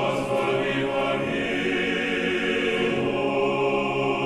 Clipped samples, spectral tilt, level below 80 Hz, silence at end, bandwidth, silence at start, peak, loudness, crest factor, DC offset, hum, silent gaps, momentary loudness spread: under 0.1%; -5.5 dB/octave; -52 dBFS; 0 s; 12.5 kHz; 0 s; -12 dBFS; -24 LUFS; 12 dB; under 0.1%; none; none; 2 LU